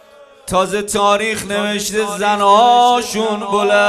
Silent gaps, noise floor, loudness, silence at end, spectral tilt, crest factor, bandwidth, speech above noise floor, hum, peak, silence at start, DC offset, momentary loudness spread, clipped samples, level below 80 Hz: none; -37 dBFS; -14 LUFS; 0 s; -3 dB/octave; 14 dB; 14 kHz; 23 dB; none; 0 dBFS; 0.45 s; under 0.1%; 9 LU; under 0.1%; -48 dBFS